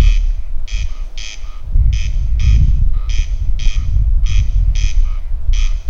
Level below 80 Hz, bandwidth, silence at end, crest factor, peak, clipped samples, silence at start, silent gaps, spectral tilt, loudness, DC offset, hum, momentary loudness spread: -14 dBFS; 7 kHz; 0 s; 12 dB; 0 dBFS; under 0.1%; 0 s; none; -5 dB/octave; -19 LUFS; under 0.1%; none; 12 LU